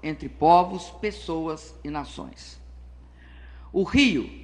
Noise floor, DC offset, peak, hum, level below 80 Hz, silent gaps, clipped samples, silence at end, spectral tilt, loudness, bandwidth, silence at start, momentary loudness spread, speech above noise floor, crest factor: -47 dBFS; under 0.1%; -4 dBFS; 60 Hz at -55 dBFS; -44 dBFS; none; under 0.1%; 0 s; -5 dB/octave; -24 LUFS; 10 kHz; 0.05 s; 21 LU; 22 dB; 22 dB